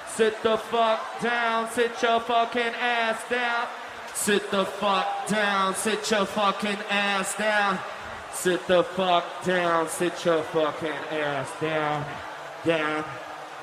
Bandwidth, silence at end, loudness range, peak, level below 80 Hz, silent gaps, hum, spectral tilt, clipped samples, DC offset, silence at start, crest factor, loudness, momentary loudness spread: 15 kHz; 0 s; 2 LU; -8 dBFS; -64 dBFS; none; none; -3.5 dB/octave; under 0.1%; under 0.1%; 0 s; 18 dB; -25 LUFS; 8 LU